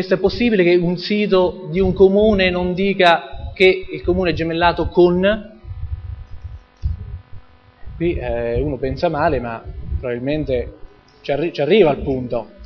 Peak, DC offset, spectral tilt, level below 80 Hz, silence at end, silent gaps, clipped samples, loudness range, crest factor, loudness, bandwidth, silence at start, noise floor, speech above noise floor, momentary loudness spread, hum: 0 dBFS; under 0.1%; -8 dB/octave; -32 dBFS; 0 s; none; under 0.1%; 9 LU; 18 dB; -17 LUFS; 6.4 kHz; 0 s; -38 dBFS; 21 dB; 18 LU; none